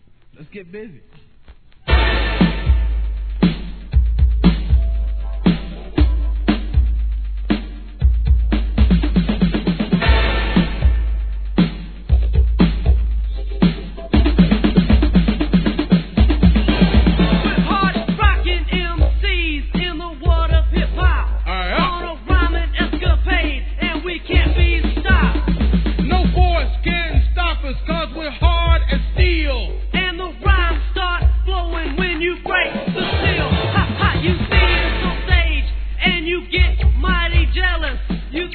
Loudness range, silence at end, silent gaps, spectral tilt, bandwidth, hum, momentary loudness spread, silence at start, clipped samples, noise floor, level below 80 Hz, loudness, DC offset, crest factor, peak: 3 LU; 0 s; none; -9.5 dB/octave; 4.5 kHz; none; 8 LU; 0.4 s; under 0.1%; -43 dBFS; -18 dBFS; -18 LUFS; 0.3%; 16 dB; 0 dBFS